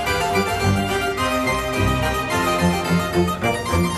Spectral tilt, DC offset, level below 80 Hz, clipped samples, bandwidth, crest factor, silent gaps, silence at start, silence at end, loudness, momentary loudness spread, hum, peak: -5 dB/octave; under 0.1%; -34 dBFS; under 0.1%; 13.5 kHz; 14 dB; none; 0 s; 0 s; -20 LUFS; 2 LU; none; -6 dBFS